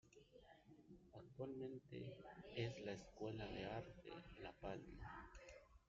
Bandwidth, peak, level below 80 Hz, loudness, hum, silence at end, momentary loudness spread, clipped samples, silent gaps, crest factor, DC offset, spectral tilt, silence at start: 7.4 kHz; -34 dBFS; -68 dBFS; -54 LUFS; none; 0.05 s; 18 LU; under 0.1%; none; 20 dB; under 0.1%; -5 dB/octave; 0.05 s